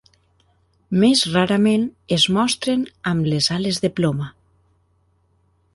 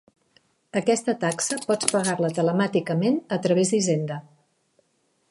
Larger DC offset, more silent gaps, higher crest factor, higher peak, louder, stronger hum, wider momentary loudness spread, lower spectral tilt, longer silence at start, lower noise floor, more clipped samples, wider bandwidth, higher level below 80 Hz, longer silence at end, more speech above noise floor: neither; neither; about the same, 18 dB vs 22 dB; about the same, -4 dBFS vs -4 dBFS; first, -19 LUFS vs -24 LUFS; neither; about the same, 7 LU vs 5 LU; about the same, -5 dB/octave vs -4.5 dB/octave; first, 0.9 s vs 0.75 s; second, -62 dBFS vs -69 dBFS; neither; about the same, 11.5 kHz vs 12 kHz; first, -54 dBFS vs -72 dBFS; first, 1.45 s vs 1.1 s; about the same, 44 dB vs 46 dB